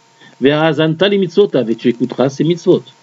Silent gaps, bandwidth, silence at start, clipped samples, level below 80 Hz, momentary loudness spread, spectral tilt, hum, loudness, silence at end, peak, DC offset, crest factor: none; 7.8 kHz; 0.4 s; under 0.1%; -62 dBFS; 4 LU; -6.5 dB/octave; none; -14 LUFS; 0.2 s; 0 dBFS; under 0.1%; 14 dB